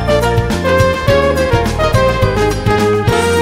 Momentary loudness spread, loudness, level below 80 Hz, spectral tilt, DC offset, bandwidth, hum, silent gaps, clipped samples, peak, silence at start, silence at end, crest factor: 2 LU; -13 LUFS; -24 dBFS; -5.5 dB/octave; under 0.1%; 16.5 kHz; none; none; under 0.1%; 0 dBFS; 0 s; 0 s; 12 dB